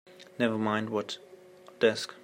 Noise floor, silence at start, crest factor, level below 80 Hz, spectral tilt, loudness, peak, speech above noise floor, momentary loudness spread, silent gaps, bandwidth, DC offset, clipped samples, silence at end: -53 dBFS; 0.1 s; 22 dB; -74 dBFS; -5 dB/octave; -30 LUFS; -10 dBFS; 23 dB; 13 LU; none; 16 kHz; under 0.1%; under 0.1%; 0.05 s